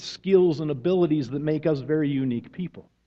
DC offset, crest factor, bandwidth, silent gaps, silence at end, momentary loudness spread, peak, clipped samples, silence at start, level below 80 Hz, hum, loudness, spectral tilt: under 0.1%; 18 dB; 7.6 kHz; none; 0.25 s; 13 LU; -8 dBFS; under 0.1%; 0 s; -60 dBFS; none; -24 LUFS; -8 dB/octave